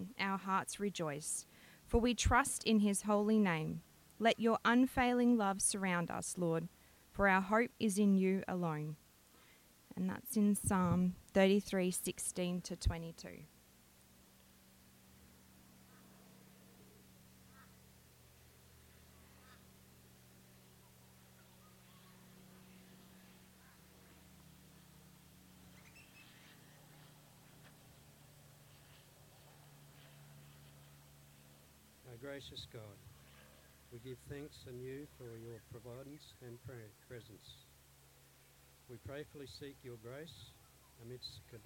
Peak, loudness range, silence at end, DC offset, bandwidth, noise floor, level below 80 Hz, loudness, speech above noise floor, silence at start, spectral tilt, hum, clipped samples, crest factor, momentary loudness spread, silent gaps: -16 dBFS; 23 LU; 0.05 s; under 0.1%; 17 kHz; -66 dBFS; -56 dBFS; -36 LUFS; 29 dB; 0 s; -4.5 dB/octave; none; under 0.1%; 24 dB; 27 LU; none